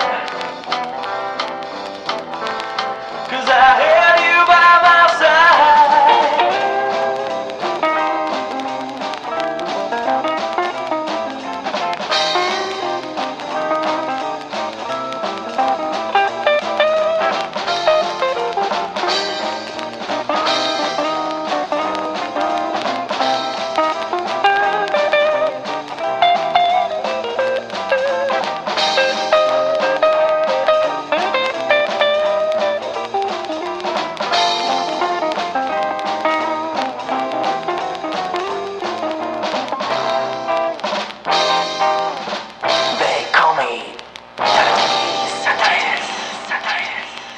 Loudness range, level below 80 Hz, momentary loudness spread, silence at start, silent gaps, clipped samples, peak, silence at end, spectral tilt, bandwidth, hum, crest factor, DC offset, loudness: 9 LU; -58 dBFS; 13 LU; 0 s; none; under 0.1%; 0 dBFS; 0 s; -2.5 dB/octave; 10 kHz; 60 Hz at -55 dBFS; 18 dB; under 0.1%; -17 LUFS